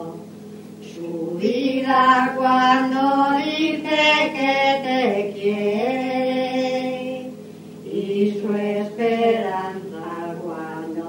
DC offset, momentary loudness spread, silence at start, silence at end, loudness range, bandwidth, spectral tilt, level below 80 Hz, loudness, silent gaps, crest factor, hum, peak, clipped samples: under 0.1%; 18 LU; 0 s; 0 s; 6 LU; 16 kHz; -5 dB/octave; -74 dBFS; -20 LUFS; none; 18 dB; none; -4 dBFS; under 0.1%